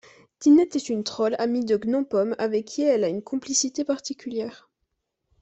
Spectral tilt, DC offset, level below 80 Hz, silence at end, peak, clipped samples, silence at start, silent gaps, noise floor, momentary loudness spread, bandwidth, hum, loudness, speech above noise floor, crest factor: -4 dB/octave; under 0.1%; -68 dBFS; 0.85 s; -8 dBFS; under 0.1%; 0.4 s; none; -78 dBFS; 12 LU; 8.4 kHz; none; -24 LUFS; 55 dB; 16 dB